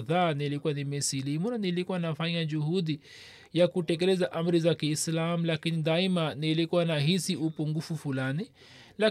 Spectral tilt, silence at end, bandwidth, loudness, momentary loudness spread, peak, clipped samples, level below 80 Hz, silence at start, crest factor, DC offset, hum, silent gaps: -5.5 dB/octave; 0 s; 14 kHz; -29 LUFS; 7 LU; -14 dBFS; under 0.1%; -74 dBFS; 0 s; 16 dB; under 0.1%; none; none